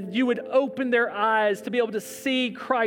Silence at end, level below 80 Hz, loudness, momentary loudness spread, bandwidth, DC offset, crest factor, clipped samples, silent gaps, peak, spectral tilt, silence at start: 0 s; -74 dBFS; -24 LUFS; 4 LU; 19 kHz; under 0.1%; 16 dB; under 0.1%; none; -8 dBFS; -4 dB/octave; 0 s